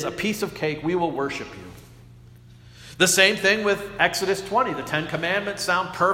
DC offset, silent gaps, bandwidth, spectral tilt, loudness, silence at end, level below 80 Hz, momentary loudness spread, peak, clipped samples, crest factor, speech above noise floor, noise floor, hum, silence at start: under 0.1%; none; 16.5 kHz; -3 dB/octave; -22 LUFS; 0 s; -54 dBFS; 12 LU; 0 dBFS; under 0.1%; 24 dB; 24 dB; -47 dBFS; 60 Hz at -50 dBFS; 0 s